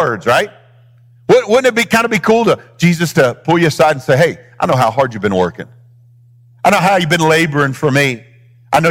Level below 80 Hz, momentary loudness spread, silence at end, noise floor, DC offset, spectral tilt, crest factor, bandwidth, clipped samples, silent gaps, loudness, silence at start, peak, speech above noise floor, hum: -50 dBFS; 6 LU; 0 s; -45 dBFS; under 0.1%; -5 dB/octave; 14 dB; 19 kHz; under 0.1%; none; -13 LUFS; 0 s; 0 dBFS; 33 dB; none